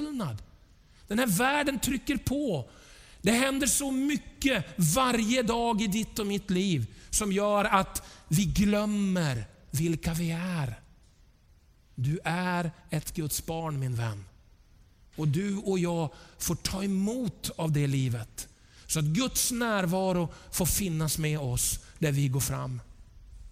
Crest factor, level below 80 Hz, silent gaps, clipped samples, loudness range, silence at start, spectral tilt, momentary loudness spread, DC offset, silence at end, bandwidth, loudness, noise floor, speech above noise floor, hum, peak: 22 dB; -48 dBFS; none; under 0.1%; 6 LU; 0 s; -4.5 dB/octave; 10 LU; under 0.1%; 0 s; 16.5 kHz; -29 LUFS; -60 dBFS; 31 dB; none; -8 dBFS